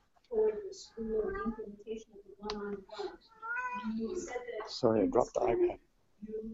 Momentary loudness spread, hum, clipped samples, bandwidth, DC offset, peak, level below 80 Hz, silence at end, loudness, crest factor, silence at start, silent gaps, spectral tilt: 15 LU; none; under 0.1%; 8 kHz; under 0.1%; -12 dBFS; -58 dBFS; 0 s; -35 LUFS; 24 dB; 0.3 s; none; -5.5 dB/octave